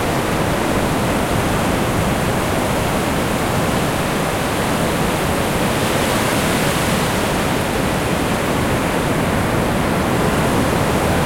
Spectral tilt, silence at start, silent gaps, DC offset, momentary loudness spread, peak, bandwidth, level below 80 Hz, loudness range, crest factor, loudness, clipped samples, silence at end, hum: -5 dB/octave; 0 s; none; under 0.1%; 2 LU; -4 dBFS; 16.5 kHz; -32 dBFS; 1 LU; 14 dB; -18 LUFS; under 0.1%; 0 s; none